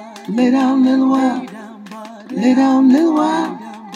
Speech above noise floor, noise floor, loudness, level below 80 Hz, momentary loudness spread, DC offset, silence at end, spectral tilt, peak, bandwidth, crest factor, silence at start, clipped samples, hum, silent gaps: 20 dB; -33 dBFS; -14 LUFS; -76 dBFS; 21 LU; under 0.1%; 0 s; -6 dB/octave; -2 dBFS; 9.8 kHz; 12 dB; 0 s; under 0.1%; none; none